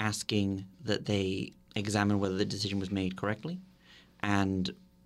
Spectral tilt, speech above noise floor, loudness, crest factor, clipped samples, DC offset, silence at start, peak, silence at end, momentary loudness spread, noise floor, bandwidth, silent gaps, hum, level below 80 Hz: -5 dB/octave; 27 dB; -33 LUFS; 20 dB; under 0.1%; under 0.1%; 0 s; -12 dBFS; 0.3 s; 9 LU; -59 dBFS; 13.5 kHz; none; none; -62 dBFS